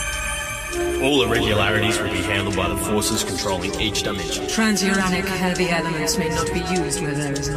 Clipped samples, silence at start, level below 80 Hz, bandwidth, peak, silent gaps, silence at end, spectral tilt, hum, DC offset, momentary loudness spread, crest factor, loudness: under 0.1%; 0 s; -36 dBFS; 15.5 kHz; -6 dBFS; none; 0 s; -3.5 dB/octave; none; under 0.1%; 6 LU; 16 dB; -21 LUFS